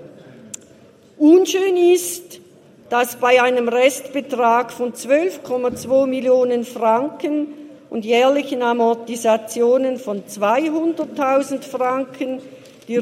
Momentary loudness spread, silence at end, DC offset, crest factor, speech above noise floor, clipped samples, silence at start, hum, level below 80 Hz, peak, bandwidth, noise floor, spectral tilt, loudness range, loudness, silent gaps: 12 LU; 0 s; under 0.1%; 18 dB; 30 dB; under 0.1%; 0 s; none; -70 dBFS; 0 dBFS; 16 kHz; -48 dBFS; -3.5 dB/octave; 3 LU; -18 LUFS; none